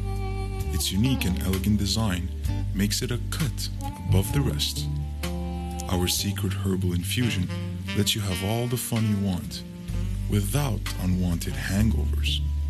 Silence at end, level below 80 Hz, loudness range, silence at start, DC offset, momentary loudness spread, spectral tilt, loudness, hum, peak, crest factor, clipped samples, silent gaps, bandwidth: 0 s; -32 dBFS; 1 LU; 0 s; under 0.1%; 7 LU; -5 dB/octave; -27 LUFS; none; -10 dBFS; 16 dB; under 0.1%; none; 14 kHz